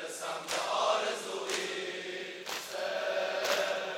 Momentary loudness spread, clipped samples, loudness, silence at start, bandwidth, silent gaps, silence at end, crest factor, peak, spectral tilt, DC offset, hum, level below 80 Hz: 8 LU; under 0.1%; -33 LUFS; 0 s; 16.5 kHz; none; 0 s; 18 dB; -16 dBFS; -1 dB/octave; under 0.1%; none; -80 dBFS